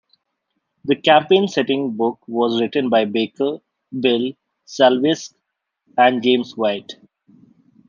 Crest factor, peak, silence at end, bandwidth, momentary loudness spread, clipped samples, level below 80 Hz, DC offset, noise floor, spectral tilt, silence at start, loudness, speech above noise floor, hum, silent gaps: 18 dB; -2 dBFS; 0.95 s; 7.4 kHz; 15 LU; under 0.1%; -70 dBFS; under 0.1%; -74 dBFS; -5 dB/octave; 0.85 s; -18 LUFS; 57 dB; none; none